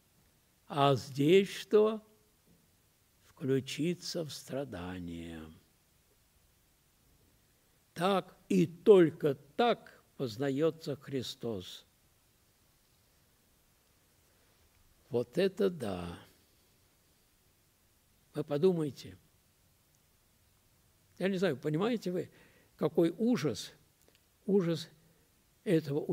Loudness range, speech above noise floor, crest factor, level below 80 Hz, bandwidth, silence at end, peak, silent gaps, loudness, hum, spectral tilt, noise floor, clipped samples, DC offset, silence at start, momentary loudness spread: 13 LU; 38 dB; 24 dB; -70 dBFS; 16 kHz; 0 s; -10 dBFS; none; -32 LUFS; none; -6.5 dB/octave; -70 dBFS; under 0.1%; under 0.1%; 0.7 s; 17 LU